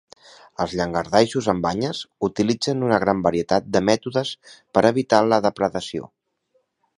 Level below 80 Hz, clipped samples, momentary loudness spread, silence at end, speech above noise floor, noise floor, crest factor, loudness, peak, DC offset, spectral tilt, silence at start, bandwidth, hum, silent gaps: -52 dBFS; under 0.1%; 10 LU; 0.9 s; 47 dB; -68 dBFS; 22 dB; -21 LUFS; 0 dBFS; under 0.1%; -5.5 dB/octave; 0.6 s; 11 kHz; none; none